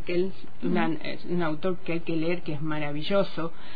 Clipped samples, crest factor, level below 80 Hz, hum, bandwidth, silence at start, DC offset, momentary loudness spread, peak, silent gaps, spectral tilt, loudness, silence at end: under 0.1%; 16 dB; -56 dBFS; none; 5 kHz; 0 s; 6%; 6 LU; -10 dBFS; none; -9 dB/octave; -30 LUFS; 0 s